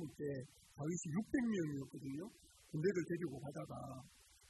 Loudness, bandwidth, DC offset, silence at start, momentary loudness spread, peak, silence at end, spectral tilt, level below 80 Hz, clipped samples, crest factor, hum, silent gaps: -43 LUFS; 12 kHz; under 0.1%; 0 s; 14 LU; -26 dBFS; 0 s; -6.5 dB/octave; -72 dBFS; under 0.1%; 18 dB; none; none